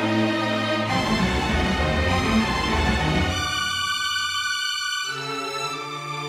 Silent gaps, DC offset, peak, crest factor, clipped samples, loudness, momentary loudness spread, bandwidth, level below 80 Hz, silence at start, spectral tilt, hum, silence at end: none; under 0.1%; -8 dBFS; 14 dB; under 0.1%; -23 LUFS; 6 LU; 16 kHz; -34 dBFS; 0 s; -4 dB/octave; none; 0 s